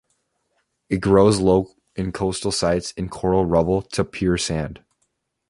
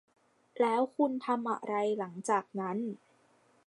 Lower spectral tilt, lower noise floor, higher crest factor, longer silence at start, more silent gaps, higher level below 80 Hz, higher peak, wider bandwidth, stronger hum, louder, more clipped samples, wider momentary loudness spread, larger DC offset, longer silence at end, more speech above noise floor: about the same, -5.5 dB/octave vs -5.5 dB/octave; first, -72 dBFS vs -67 dBFS; about the same, 20 dB vs 18 dB; first, 0.9 s vs 0.55 s; neither; first, -40 dBFS vs -88 dBFS; first, -2 dBFS vs -16 dBFS; about the same, 11.5 kHz vs 11.5 kHz; neither; first, -21 LUFS vs -33 LUFS; neither; first, 13 LU vs 8 LU; neither; about the same, 0.7 s vs 0.7 s; first, 52 dB vs 35 dB